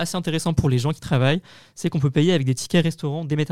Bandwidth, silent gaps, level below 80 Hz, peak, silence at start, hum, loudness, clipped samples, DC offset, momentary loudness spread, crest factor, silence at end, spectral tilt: 14.5 kHz; none; -46 dBFS; -6 dBFS; 0 s; none; -22 LUFS; under 0.1%; 0.8%; 7 LU; 16 dB; 0 s; -6 dB/octave